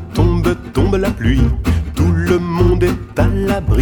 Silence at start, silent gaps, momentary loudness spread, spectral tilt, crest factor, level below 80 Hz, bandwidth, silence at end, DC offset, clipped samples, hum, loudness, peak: 0 s; none; 4 LU; -7.5 dB/octave; 14 dB; -20 dBFS; 18.5 kHz; 0 s; under 0.1%; under 0.1%; none; -16 LUFS; 0 dBFS